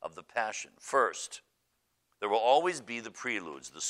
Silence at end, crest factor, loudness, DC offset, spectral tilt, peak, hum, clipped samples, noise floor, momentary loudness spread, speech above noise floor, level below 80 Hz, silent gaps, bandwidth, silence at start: 0 s; 20 dB; -31 LUFS; under 0.1%; -1.5 dB/octave; -12 dBFS; none; under 0.1%; -78 dBFS; 15 LU; 46 dB; -80 dBFS; none; 13 kHz; 0 s